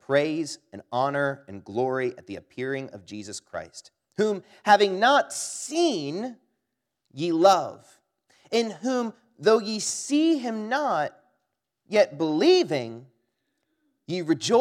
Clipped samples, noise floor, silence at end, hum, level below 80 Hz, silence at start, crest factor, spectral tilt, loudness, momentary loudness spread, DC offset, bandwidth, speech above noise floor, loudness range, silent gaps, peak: under 0.1%; -81 dBFS; 0 s; none; -78 dBFS; 0.1 s; 22 dB; -4 dB/octave; -25 LUFS; 18 LU; under 0.1%; 14.5 kHz; 57 dB; 6 LU; none; -4 dBFS